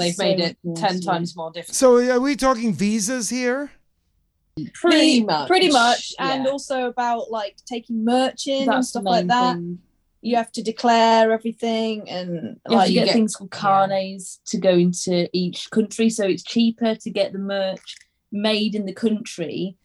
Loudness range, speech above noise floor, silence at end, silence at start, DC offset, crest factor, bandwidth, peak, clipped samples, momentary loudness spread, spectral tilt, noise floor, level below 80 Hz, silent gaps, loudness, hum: 3 LU; 47 dB; 0.1 s; 0 s; under 0.1%; 18 dB; 13 kHz; -2 dBFS; under 0.1%; 13 LU; -4.5 dB/octave; -68 dBFS; -58 dBFS; none; -20 LUFS; none